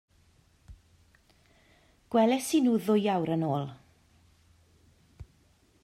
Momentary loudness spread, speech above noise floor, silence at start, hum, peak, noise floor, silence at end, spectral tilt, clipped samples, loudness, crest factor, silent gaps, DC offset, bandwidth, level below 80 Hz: 7 LU; 39 dB; 0.7 s; none; -14 dBFS; -65 dBFS; 0.6 s; -6 dB/octave; under 0.1%; -27 LUFS; 18 dB; none; under 0.1%; 15 kHz; -64 dBFS